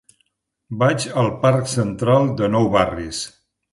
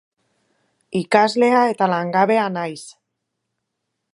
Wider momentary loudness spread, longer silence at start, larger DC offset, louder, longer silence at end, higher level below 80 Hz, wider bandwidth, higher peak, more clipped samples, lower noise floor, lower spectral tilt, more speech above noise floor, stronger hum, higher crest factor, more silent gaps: about the same, 11 LU vs 12 LU; second, 0.7 s vs 0.9 s; neither; about the same, -19 LUFS vs -18 LUFS; second, 0.45 s vs 1.2 s; first, -46 dBFS vs -70 dBFS; about the same, 11.5 kHz vs 11.5 kHz; about the same, -2 dBFS vs -2 dBFS; neither; second, -68 dBFS vs -77 dBFS; about the same, -6 dB/octave vs -5.5 dB/octave; second, 50 dB vs 60 dB; neither; about the same, 16 dB vs 20 dB; neither